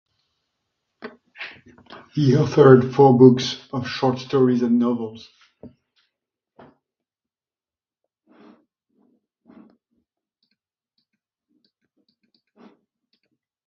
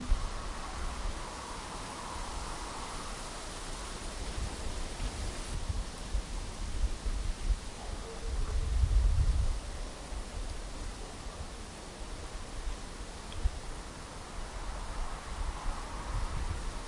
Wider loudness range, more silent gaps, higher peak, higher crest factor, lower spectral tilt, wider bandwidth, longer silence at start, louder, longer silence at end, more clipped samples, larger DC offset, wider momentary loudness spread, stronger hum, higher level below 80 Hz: about the same, 9 LU vs 7 LU; neither; first, 0 dBFS vs -16 dBFS; about the same, 22 dB vs 20 dB; first, -7.5 dB/octave vs -4 dB/octave; second, 6.8 kHz vs 11.5 kHz; first, 1.05 s vs 0 s; first, -17 LUFS vs -39 LUFS; first, 8 s vs 0 s; neither; neither; first, 24 LU vs 9 LU; neither; second, -62 dBFS vs -36 dBFS